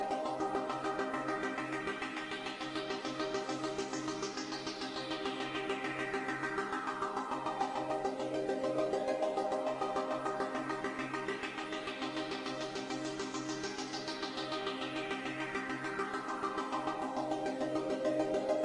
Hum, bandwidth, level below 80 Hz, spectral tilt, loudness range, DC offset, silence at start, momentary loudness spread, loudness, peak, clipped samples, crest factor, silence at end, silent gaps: none; 11.5 kHz; -70 dBFS; -4 dB/octave; 3 LU; under 0.1%; 0 s; 5 LU; -37 LUFS; -20 dBFS; under 0.1%; 18 dB; 0 s; none